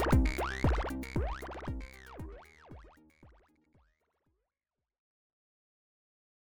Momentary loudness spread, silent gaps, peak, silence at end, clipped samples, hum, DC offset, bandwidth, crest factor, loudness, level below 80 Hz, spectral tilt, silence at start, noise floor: 23 LU; none; -16 dBFS; 1.55 s; under 0.1%; none; under 0.1%; over 20 kHz; 22 dB; -35 LUFS; -40 dBFS; -6.5 dB/octave; 0 s; under -90 dBFS